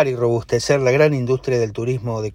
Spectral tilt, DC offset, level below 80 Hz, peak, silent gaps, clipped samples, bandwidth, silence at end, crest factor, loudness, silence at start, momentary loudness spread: -6 dB/octave; under 0.1%; -48 dBFS; -2 dBFS; none; under 0.1%; 15.5 kHz; 0 s; 16 dB; -19 LUFS; 0 s; 8 LU